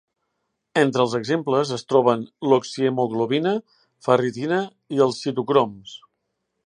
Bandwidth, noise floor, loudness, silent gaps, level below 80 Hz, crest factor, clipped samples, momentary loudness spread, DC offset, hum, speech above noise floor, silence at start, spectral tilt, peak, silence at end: 10.5 kHz; -76 dBFS; -22 LUFS; none; -70 dBFS; 20 dB; under 0.1%; 8 LU; under 0.1%; none; 55 dB; 0.75 s; -6 dB/octave; -2 dBFS; 0.7 s